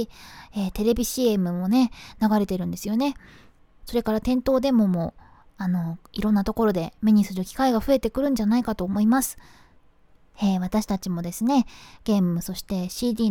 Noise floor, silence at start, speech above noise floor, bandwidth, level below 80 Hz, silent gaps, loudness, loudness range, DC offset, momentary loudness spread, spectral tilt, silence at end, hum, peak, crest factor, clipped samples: -55 dBFS; 0 s; 32 dB; 18 kHz; -44 dBFS; none; -24 LUFS; 3 LU; under 0.1%; 9 LU; -6 dB/octave; 0 s; none; -8 dBFS; 16 dB; under 0.1%